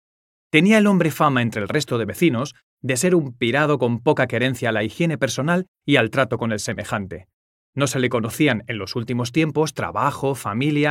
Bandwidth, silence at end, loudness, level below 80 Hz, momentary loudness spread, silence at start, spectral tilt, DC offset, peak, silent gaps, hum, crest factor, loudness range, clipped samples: 16.5 kHz; 0 s; -20 LUFS; -58 dBFS; 9 LU; 0.55 s; -5.5 dB/octave; under 0.1%; 0 dBFS; 2.63-2.77 s, 5.68-5.75 s, 7.33-7.73 s; none; 20 dB; 4 LU; under 0.1%